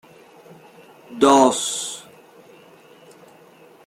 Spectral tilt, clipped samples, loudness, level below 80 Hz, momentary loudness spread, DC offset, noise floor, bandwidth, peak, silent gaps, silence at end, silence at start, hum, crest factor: -3 dB/octave; under 0.1%; -18 LUFS; -64 dBFS; 22 LU; under 0.1%; -49 dBFS; 15.5 kHz; -2 dBFS; none; 1.85 s; 1.1 s; none; 20 dB